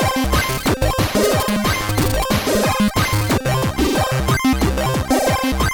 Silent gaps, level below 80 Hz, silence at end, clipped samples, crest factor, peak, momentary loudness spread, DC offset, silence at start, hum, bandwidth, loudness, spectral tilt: none; -26 dBFS; 0 s; under 0.1%; 12 dB; -6 dBFS; 2 LU; under 0.1%; 0 s; none; over 20 kHz; -18 LUFS; -4.5 dB/octave